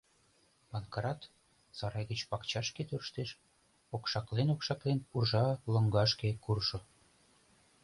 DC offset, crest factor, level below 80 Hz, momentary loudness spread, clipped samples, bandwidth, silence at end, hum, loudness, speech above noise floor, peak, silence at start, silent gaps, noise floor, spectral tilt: under 0.1%; 20 dB; -60 dBFS; 14 LU; under 0.1%; 11.5 kHz; 1 s; none; -35 LUFS; 36 dB; -16 dBFS; 0.7 s; none; -70 dBFS; -5.5 dB/octave